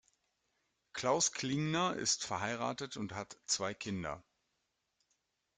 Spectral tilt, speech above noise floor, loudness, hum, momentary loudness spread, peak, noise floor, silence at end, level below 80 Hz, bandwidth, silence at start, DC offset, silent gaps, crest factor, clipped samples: -3 dB/octave; 47 dB; -36 LUFS; none; 12 LU; -18 dBFS; -84 dBFS; 1.35 s; -72 dBFS; 11 kHz; 0.95 s; under 0.1%; none; 20 dB; under 0.1%